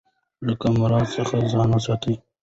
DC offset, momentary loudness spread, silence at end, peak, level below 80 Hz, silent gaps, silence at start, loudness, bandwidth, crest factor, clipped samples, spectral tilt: under 0.1%; 8 LU; 0.25 s; -8 dBFS; -46 dBFS; none; 0.4 s; -22 LUFS; 8 kHz; 12 dB; under 0.1%; -7 dB/octave